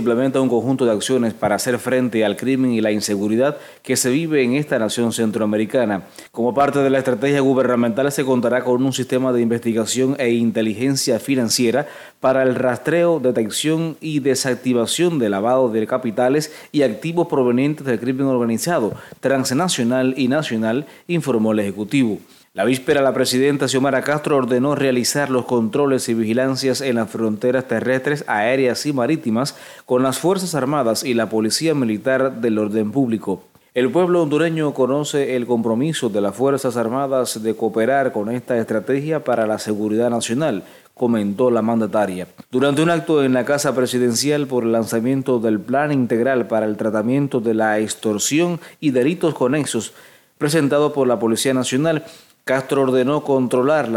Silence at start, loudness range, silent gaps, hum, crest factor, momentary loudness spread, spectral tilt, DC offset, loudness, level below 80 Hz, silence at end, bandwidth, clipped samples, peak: 0 s; 2 LU; none; none; 14 dB; 5 LU; -5 dB/octave; under 0.1%; -19 LUFS; -64 dBFS; 0 s; 17 kHz; under 0.1%; -4 dBFS